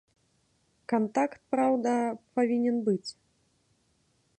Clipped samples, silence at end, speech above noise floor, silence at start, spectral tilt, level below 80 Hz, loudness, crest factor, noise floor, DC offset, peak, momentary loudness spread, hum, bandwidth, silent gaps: under 0.1%; 1.25 s; 43 dB; 0.9 s; -6 dB/octave; -78 dBFS; -28 LUFS; 16 dB; -71 dBFS; under 0.1%; -14 dBFS; 6 LU; none; 9 kHz; none